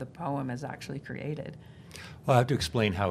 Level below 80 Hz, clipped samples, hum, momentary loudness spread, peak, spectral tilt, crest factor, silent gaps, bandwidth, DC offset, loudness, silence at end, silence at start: -58 dBFS; under 0.1%; none; 20 LU; -8 dBFS; -6 dB/octave; 24 dB; none; 14.5 kHz; under 0.1%; -30 LUFS; 0 s; 0 s